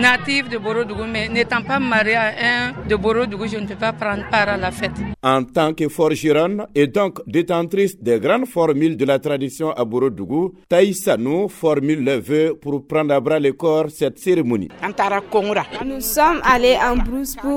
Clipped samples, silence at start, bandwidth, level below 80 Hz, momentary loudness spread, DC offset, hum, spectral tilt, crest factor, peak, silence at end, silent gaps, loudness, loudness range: under 0.1%; 0 s; 17.5 kHz; -38 dBFS; 7 LU; under 0.1%; none; -5 dB/octave; 18 dB; 0 dBFS; 0 s; none; -19 LUFS; 1 LU